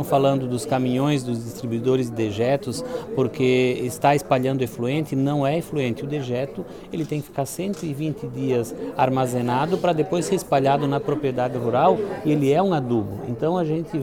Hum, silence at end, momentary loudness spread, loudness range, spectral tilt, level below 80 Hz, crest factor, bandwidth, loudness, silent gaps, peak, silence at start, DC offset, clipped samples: none; 0 s; 8 LU; 5 LU; -6.5 dB/octave; -54 dBFS; 18 dB; 18 kHz; -23 LUFS; none; -4 dBFS; 0 s; 0.2%; under 0.1%